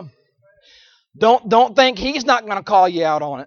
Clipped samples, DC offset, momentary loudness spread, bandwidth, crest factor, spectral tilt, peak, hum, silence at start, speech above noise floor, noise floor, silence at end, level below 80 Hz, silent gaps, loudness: under 0.1%; under 0.1%; 6 LU; 7 kHz; 16 dB; -4 dB/octave; -2 dBFS; none; 0 s; 42 dB; -57 dBFS; 0 s; -50 dBFS; none; -16 LUFS